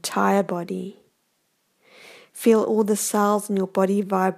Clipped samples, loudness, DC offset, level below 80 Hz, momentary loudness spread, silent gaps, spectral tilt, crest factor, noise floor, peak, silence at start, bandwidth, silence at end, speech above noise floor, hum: under 0.1%; -22 LUFS; under 0.1%; -76 dBFS; 12 LU; none; -5 dB/octave; 18 dB; -70 dBFS; -6 dBFS; 0.05 s; 15.5 kHz; 0 s; 49 dB; none